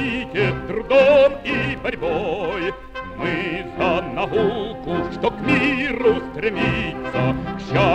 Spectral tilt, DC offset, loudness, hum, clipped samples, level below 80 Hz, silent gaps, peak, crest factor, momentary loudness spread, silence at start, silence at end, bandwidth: -7 dB/octave; under 0.1%; -20 LUFS; none; under 0.1%; -40 dBFS; none; -4 dBFS; 16 dB; 11 LU; 0 s; 0 s; 8.6 kHz